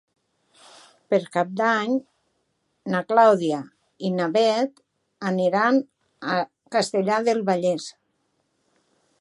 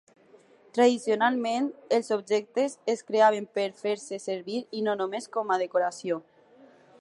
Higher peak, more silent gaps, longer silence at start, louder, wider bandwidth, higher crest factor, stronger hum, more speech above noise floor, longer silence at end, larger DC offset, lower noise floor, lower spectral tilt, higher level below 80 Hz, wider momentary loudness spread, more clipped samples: first, -4 dBFS vs -8 dBFS; neither; first, 1.1 s vs 0.75 s; first, -23 LUFS vs -27 LUFS; about the same, 11.5 kHz vs 11.5 kHz; about the same, 20 dB vs 18 dB; neither; first, 51 dB vs 31 dB; first, 1.3 s vs 0.8 s; neither; first, -72 dBFS vs -57 dBFS; first, -5.5 dB/octave vs -4 dB/octave; first, -78 dBFS vs -84 dBFS; first, 13 LU vs 10 LU; neither